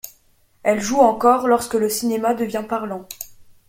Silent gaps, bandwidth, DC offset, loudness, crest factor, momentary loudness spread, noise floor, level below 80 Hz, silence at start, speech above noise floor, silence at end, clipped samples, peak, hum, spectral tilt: none; 17 kHz; under 0.1%; -19 LUFS; 18 dB; 19 LU; -57 dBFS; -56 dBFS; 0.05 s; 39 dB; 0.25 s; under 0.1%; -2 dBFS; none; -4 dB/octave